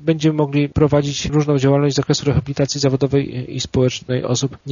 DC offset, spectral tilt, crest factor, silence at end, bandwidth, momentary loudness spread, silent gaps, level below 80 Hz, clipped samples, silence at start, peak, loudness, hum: under 0.1%; -6.5 dB/octave; 16 dB; 0 s; 7.4 kHz; 5 LU; none; -40 dBFS; under 0.1%; 0 s; -2 dBFS; -18 LUFS; none